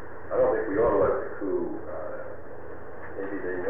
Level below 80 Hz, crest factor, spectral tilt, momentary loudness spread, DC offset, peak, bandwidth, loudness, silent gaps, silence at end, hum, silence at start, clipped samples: -50 dBFS; 16 dB; -10.5 dB/octave; 18 LU; 2%; -14 dBFS; 3.4 kHz; -28 LUFS; none; 0 s; none; 0 s; under 0.1%